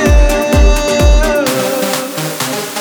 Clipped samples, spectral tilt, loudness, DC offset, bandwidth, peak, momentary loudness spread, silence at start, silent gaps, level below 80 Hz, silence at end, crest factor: under 0.1%; -4.5 dB/octave; -12 LUFS; under 0.1%; over 20 kHz; 0 dBFS; 7 LU; 0 s; none; -14 dBFS; 0 s; 10 dB